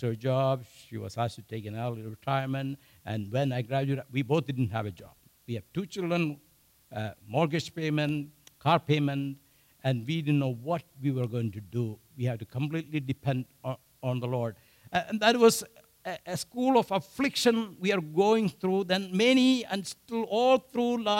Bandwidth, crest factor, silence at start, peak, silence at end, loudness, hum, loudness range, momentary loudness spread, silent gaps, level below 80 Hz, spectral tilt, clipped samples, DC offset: 16 kHz; 22 dB; 0 s; -8 dBFS; 0 s; -29 LUFS; none; 7 LU; 14 LU; none; -68 dBFS; -5.5 dB/octave; under 0.1%; under 0.1%